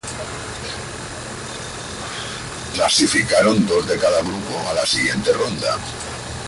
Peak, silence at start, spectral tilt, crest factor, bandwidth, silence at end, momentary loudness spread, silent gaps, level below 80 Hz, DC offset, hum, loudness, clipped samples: -4 dBFS; 0.05 s; -3 dB/octave; 18 dB; 11.5 kHz; 0 s; 14 LU; none; -44 dBFS; under 0.1%; none; -20 LUFS; under 0.1%